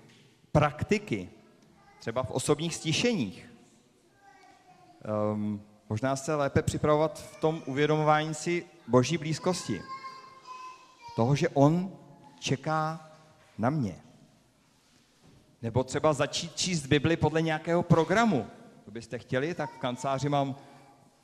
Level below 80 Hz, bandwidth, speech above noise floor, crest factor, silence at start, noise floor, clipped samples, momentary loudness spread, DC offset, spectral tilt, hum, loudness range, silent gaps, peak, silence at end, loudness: -56 dBFS; 13.5 kHz; 36 dB; 22 dB; 0.55 s; -64 dBFS; under 0.1%; 18 LU; under 0.1%; -5.5 dB/octave; none; 6 LU; none; -8 dBFS; 0.6 s; -29 LUFS